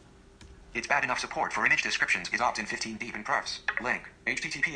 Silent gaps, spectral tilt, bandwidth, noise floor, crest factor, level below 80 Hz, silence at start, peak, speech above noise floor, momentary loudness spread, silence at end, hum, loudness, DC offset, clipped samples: none; -2 dB/octave; 10.5 kHz; -53 dBFS; 20 dB; -58 dBFS; 0.4 s; -10 dBFS; 23 dB; 9 LU; 0 s; none; -29 LUFS; under 0.1%; under 0.1%